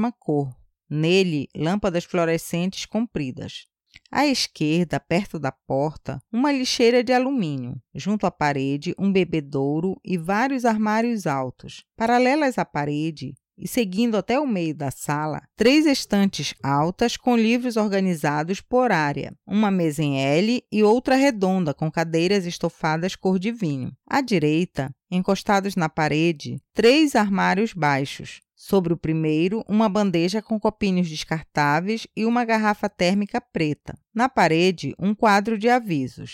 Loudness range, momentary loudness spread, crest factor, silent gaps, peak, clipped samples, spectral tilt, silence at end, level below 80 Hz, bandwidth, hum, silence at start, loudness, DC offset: 3 LU; 10 LU; 14 dB; none; -8 dBFS; under 0.1%; -5.5 dB/octave; 0 s; -54 dBFS; 16.5 kHz; none; 0 s; -22 LUFS; under 0.1%